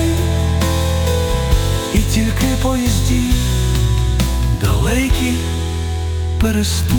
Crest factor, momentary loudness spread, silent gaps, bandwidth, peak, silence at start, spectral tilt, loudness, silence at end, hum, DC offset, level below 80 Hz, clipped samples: 12 dB; 4 LU; none; 19.5 kHz; -2 dBFS; 0 s; -5 dB/octave; -17 LUFS; 0 s; none; under 0.1%; -20 dBFS; under 0.1%